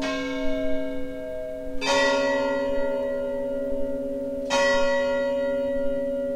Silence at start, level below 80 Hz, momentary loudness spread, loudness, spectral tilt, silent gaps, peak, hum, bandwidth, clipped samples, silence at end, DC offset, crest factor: 0 s; -42 dBFS; 11 LU; -26 LUFS; -3.5 dB/octave; none; -10 dBFS; none; 12 kHz; under 0.1%; 0 s; under 0.1%; 16 dB